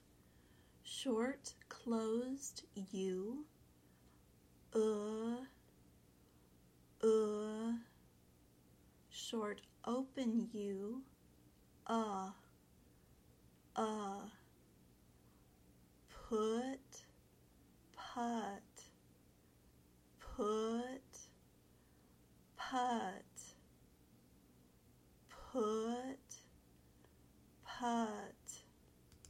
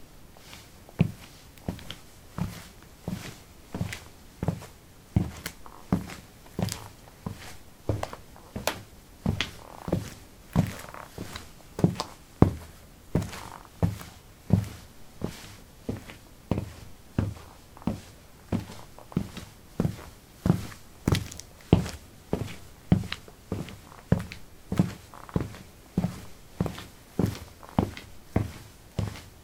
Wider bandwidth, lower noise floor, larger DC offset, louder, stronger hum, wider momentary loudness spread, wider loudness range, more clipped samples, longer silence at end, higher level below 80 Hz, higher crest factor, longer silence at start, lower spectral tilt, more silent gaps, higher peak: about the same, 16.5 kHz vs 18 kHz; first, -69 dBFS vs -50 dBFS; neither; second, -43 LUFS vs -32 LUFS; neither; about the same, 20 LU vs 19 LU; about the same, 5 LU vs 6 LU; neither; about the same, 0 s vs 0 s; second, -72 dBFS vs -46 dBFS; second, 20 dB vs 30 dB; first, 0.85 s vs 0 s; second, -4.5 dB/octave vs -6.5 dB/octave; neither; second, -24 dBFS vs -2 dBFS